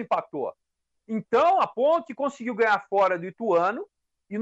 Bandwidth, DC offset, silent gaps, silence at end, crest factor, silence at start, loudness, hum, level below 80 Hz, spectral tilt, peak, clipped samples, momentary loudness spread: 8.2 kHz; under 0.1%; none; 0 s; 14 dB; 0 s; -25 LUFS; none; -72 dBFS; -6 dB/octave; -12 dBFS; under 0.1%; 13 LU